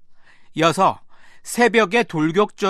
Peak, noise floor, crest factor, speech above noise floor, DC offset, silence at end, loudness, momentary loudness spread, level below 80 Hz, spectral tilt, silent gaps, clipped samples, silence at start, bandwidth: -2 dBFS; -43 dBFS; 18 dB; 25 dB; under 0.1%; 0 s; -18 LUFS; 17 LU; -56 dBFS; -4.5 dB/octave; none; under 0.1%; 0.1 s; 13.5 kHz